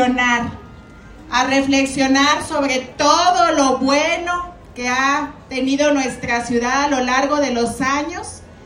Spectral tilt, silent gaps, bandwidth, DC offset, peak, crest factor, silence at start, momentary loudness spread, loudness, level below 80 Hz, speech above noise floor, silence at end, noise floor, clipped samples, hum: -3 dB/octave; none; 12 kHz; under 0.1%; -2 dBFS; 16 dB; 0 s; 11 LU; -17 LUFS; -44 dBFS; 22 dB; 0 s; -39 dBFS; under 0.1%; none